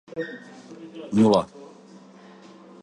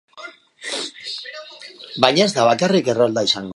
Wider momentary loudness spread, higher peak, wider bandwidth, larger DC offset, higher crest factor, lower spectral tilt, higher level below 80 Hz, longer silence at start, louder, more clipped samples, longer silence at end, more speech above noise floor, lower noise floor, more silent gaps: first, 26 LU vs 22 LU; second, -8 dBFS vs 0 dBFS; about the same, 10.5 kHz vs 11.5 kHz; neither; about the same, 20 dB vs 20 dB; first, -6.5 dB/octave vs -4 dB/octave; about the same, -62 dBFS vs -64 dBFS; about the same, 0.15 s vs 0.15 s; second, -22 LUFS vs -18 LUFS; neither; first, 1.15 s vs 0.05 s; about the same, 25 dB vs 23 dB; first, -48 dBFS vs -40 dBFS; neither